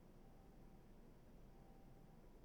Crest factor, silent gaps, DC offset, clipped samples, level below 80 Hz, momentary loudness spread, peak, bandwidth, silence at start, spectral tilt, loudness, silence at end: 12 dB; none; under 0.1%; under 0.1%; -66 dBFS; 1 LU; -52 dBFS; 19.5 kHz; 0 s; -7 dB/octave; -67 LUFS; 0 s